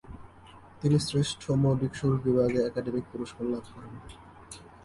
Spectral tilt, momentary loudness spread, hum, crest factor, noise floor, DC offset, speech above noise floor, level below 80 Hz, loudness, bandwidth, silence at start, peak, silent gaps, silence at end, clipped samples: -6.5 dB/octave; 21 LU; none; 16 dB; -51 dBFS; under 0.1%; 24 dB; -54 dBFS; -28 LUFS; 11.5 kHz; 0.05 s; -12 dBFS; none; 0.15 s; under 0.1%